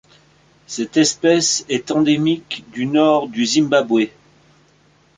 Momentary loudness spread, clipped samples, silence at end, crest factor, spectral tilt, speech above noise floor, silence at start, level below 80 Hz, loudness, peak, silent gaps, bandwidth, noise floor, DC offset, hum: 10 LU; under 0.1%; 1.1 s; 16 dB; -3.5 dB/octave; 38 dB; 0.7 s; -60 dBFS; -17 LUFS; -2 dBFS; none; 9.6 kHz; -55 dBFS; under 0.1%; none